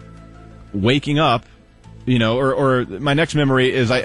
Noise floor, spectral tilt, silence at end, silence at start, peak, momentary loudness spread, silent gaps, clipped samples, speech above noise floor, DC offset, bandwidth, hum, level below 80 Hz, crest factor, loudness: -43 dBFS; -6 dB/octave; 0 s; 0 s; -4 dBFS; 5 LU; none; under 0.1%; 26 dB; under 0.1%; 11 kHz; none; -46 dBFS; 14 dB; -18 LUFS